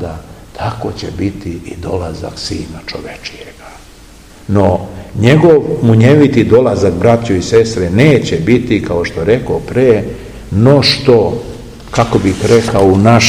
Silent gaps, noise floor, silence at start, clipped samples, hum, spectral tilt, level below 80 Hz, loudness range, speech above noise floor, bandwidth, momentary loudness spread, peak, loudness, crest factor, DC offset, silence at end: none; -37 dBFS; 0 s; 1%; none; -6 dB/octave; -34 dBFS; 12 LU; 26 dB; 14.5 kHz; 17 LU; 0 dBFS; -11 LUFS; 12 dB; 0.3%; 0 s